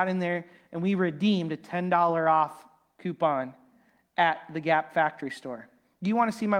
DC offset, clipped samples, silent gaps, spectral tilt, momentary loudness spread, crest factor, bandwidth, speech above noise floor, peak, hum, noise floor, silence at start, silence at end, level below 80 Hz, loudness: under 0.1%; under 0.1%; none; -7 dB/octave; 14 LU; 18 dB; 11.5 kHz; 37 dB; -10 dBFS; none; -64 dBFS; 0 s; 0 s; -76 dBFS; -27 LUFS